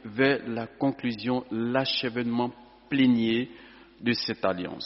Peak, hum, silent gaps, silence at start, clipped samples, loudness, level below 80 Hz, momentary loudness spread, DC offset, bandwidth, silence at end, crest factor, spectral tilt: -8 dBFS; none; none; 0.05 s; under 0.1%; -27 LUFS; -64 dBFS; 8 LU; under 0.1%; 6 kHz; 0 s; 20 dB; -3.5 dB/octave